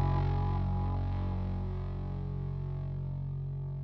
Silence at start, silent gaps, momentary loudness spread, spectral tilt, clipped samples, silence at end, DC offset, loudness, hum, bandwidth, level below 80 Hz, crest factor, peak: 0 s; none; 6 LU; -10.5 dB/octave; under 0.1%; 0 s; under 0.1%; -35 LUFS; none; 5.4 kHz; -40 dBFS; 12 dB; -20 dBFS